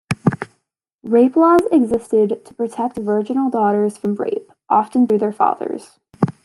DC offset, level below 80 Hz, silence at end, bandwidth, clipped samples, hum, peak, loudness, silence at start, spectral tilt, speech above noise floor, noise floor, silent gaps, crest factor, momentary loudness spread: under 0.1%; -56 dBFS; 0.15 s; 12 kHz; under 0.1%; none; -2 dBFS; -18 LUFS; 0.1 s; -8 dB/octave; 53 dB; -70 dBFS; 0.94-0.99 s; 16 dB; 13 LU